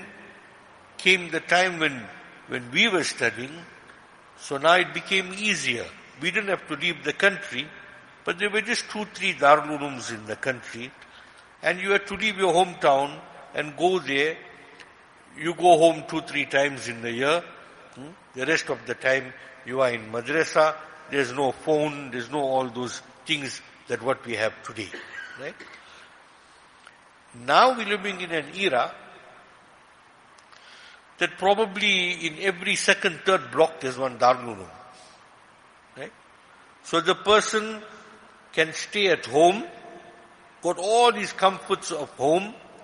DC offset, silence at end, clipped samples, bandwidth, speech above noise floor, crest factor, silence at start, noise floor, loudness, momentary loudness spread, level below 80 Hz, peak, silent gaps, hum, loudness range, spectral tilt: under 0.1%; 0 s; under 0.1%; 11 kHz; 30 dB; 24 dB; 0 s; -54 dBFS; -24 LUFS; 18 LU; -68 dBFS; -2 dBFS; none; none; 6 LU; -3 dB/octave